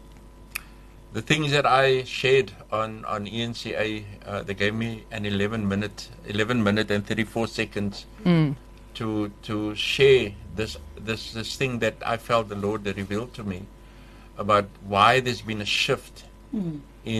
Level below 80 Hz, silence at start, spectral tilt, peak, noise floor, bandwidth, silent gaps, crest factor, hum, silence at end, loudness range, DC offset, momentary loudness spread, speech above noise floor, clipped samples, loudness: -48 dBFS; 0 s; -5 dB/octave; -2 dBFS; -46 dBFS; 13 kHz; none; 22 dB; none; 0 s; 4 LU; under 0.1%; 15 LU; 21 dB; under 0.1%; -25 LUFS